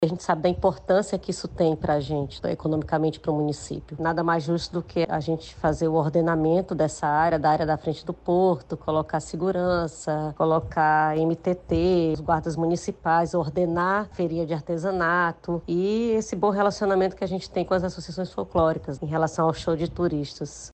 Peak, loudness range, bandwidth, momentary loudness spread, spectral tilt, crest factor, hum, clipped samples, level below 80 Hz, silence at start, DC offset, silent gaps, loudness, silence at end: -8 dBFS; 3 LU; 8.8 kHz; 7 LU; -6.5 dB/octave; 16 dB; none; under 0.1%; -46 dBFS; 0 s; under 0.1%; none; -25 LUFS; 0 s